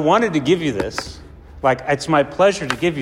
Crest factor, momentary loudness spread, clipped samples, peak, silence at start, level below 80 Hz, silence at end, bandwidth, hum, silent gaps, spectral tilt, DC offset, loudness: 16 dB; 9 LU; under 0.1%; -4 dBFS; 0 s; -44 dBFS; 0 s; 15.5 kHz; none; none; -5 dB/octave; under 0.1%; -19 LUFS